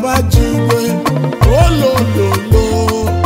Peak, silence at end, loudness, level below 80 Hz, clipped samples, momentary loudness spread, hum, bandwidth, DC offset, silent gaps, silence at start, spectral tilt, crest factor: 0 dBFS; 0 s; -12 LUFS; -18 dBFS; under 0.1%; 4 LU; none; 16.5 kHz; under 0.1%; none; 0 s; -6 dB/octave; 12 dB